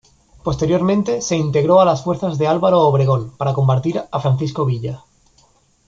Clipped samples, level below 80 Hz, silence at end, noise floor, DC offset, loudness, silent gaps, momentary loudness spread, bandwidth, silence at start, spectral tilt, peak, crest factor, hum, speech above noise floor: under 0.1%; -46 dBFS; 0.9 s; -56 dBFS; under 0.1%; -17 LUFS; none; 9 LU; 7.6 kHz; 0.45 s; -7 dB/octave; -2 dBFS; 16 dB; none; 39 dB